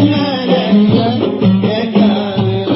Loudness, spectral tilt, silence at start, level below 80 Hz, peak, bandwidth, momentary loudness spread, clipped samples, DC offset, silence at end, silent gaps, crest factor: -12 LUFS; -11.5 dB/octave; 0 s; -46 dBFS; 0 dBFS; 5.8 kHz; 4 LU; under 0.1%; under 0.1%; 0 s; none; 12 dB